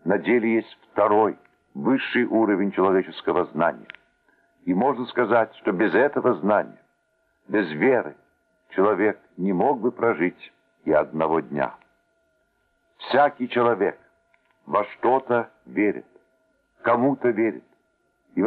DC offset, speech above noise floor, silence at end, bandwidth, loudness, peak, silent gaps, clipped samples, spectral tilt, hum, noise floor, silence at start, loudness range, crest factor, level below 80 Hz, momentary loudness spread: under 0.1%; 47 dB; 0 s; 4.7 kHz; -23 LUFS; -6 dBFS; none; under 0.1%; -9.5 dB/octave; none; -69 dBFS; 0.05 s; 3 LU; 18 dB; -68 dBFS; 9 LU